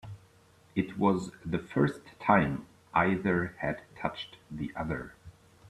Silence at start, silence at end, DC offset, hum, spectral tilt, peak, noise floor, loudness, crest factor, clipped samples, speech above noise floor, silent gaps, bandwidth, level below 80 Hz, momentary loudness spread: 0.05 s; 0 s; under 0.1%; none; -7.5 dB/octave; -8 dBFS; -61 dBFS; -31 LUFS; 24 dB; under 0.1%; 31 dB; none; 12 kHz; -56 dBFS; 15 LU